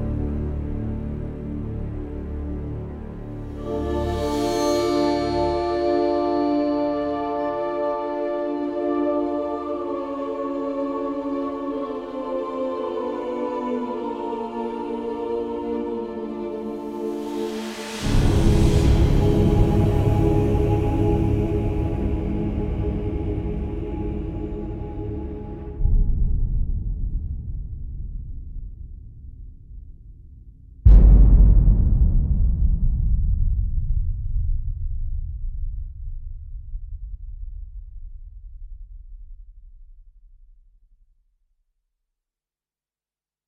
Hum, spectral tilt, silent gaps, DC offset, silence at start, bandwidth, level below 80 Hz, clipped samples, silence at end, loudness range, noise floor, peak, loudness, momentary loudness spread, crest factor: none; -8 dB/octave; none; under 0.1%; 0 s; 10.5 kHz; -24 dBFS; under 0.1%; 3.2 s; 16 LU; under -90 dBFS; -2 dBFS; -24 LUFS; 19 LU; 20 dB